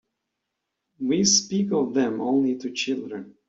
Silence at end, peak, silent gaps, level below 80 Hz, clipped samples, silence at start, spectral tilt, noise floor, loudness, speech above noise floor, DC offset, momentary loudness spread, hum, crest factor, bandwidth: 0.15 s; -6 dBFS; none; -66 dBFS; under 0.1%; 1 s; -3.5 dB/octave; -81 dBFS; -23 LUFS; 58 dB; under 0.1%; 11 LU; none; 18 dB; 8 kHz